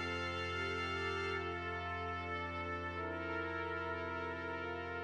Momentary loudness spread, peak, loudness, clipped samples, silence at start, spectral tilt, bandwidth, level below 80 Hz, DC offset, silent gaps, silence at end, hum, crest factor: 3 LU; -28 dBFS; -40 LUFS; under 0.1%; 0 s; -5.5 dB/octave; 10.5 kHz; -60 dBFS; under 0.1%; none; 0 s; none; 14 dB